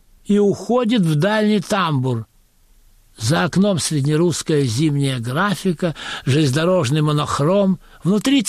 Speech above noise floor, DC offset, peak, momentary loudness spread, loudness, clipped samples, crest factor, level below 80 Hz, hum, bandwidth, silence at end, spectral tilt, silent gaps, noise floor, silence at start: 36 dB; under 0.1%; -8 dBFS; 5 LU; -18 LUFS; under 0.1%; 10 dB; -50 dBFS; none; 14.5 kHz; 0 s; -5.5 dB/octave; none; -53 dBFS; 0.3 s